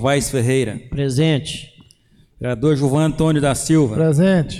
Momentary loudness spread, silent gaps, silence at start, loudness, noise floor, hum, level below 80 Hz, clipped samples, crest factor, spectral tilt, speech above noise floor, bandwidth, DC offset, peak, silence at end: 10 LU; none; 0 s; -17 LUFS; -53 dBFS; none; -40 dBFS; under 0.1%; 12 dB; -6 dB/octave; 36 dB; 15 kHz; under 0.1%; -6 dBFS; 0 s